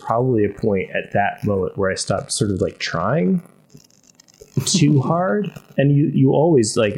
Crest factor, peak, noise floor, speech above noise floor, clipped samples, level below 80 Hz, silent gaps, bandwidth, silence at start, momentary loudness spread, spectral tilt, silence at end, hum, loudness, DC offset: 16 dB; -4 dBFS; -52 dBFS; 34 dB; under 0.1%; -52 dBFS; none; 15.5 kHz; 0 s; 7 LU; -5.5 dB/octave; 0 s; none; -19 LUFS; under 0.1%